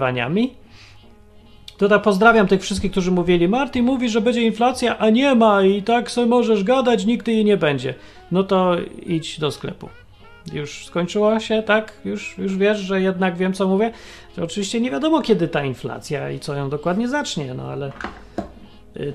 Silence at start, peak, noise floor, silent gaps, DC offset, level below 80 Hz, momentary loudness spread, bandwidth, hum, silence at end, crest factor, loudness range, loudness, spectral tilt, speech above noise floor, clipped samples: 0 s; 0 dBFS; -46 dBFS; none; under 0.1%; -46 dBFS; 14 LU; 12.5 kHz; none; 0 s; 20 dB; 6 LU; -19 LUFS; -6 dB/octave; 27 dB; under 0.1%